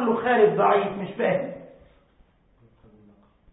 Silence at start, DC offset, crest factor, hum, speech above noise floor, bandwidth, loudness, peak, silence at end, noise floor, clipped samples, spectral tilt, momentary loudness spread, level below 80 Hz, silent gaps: 0 s; under 0.1%; 20 dB; none; 38 dB; 4 kHz; -22 LUFS; -6 dBFS; 1.85 s; -60 dBFS; under 0.1%; -10.5 dB/octave; 14 LU; -62 dBFS; none